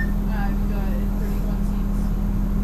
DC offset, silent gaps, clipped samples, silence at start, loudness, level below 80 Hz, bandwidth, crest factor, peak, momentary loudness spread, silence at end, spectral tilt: under 0.1%; none; under 0.1%; 0 s; -25 LUFS; -24 dBFS; 14 kHz; 10 dB; -10 dBFS; 1 LU; 0 s; -8 dB/octave